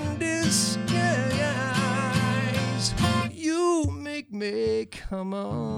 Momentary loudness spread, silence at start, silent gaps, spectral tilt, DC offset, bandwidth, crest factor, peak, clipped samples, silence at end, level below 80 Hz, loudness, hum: 8 LU; 0 s; none; -4.5 dB/octave; under 0.1%; 16 kHz; 16 dB; -10 dBFS; under 0.1%; 0 s; -46 dBFS; -26 LUFS; none